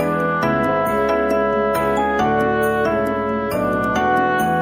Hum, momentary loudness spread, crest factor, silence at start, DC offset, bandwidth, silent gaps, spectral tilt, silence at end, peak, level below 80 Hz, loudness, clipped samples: none; 3 LU; 12 dB; 0 s; under 0.1%; 16.5 kHz; none; -6 dB/octave; 0 s; -6 dBFS; -42 dBFS; -18 LUFS; under 0.1%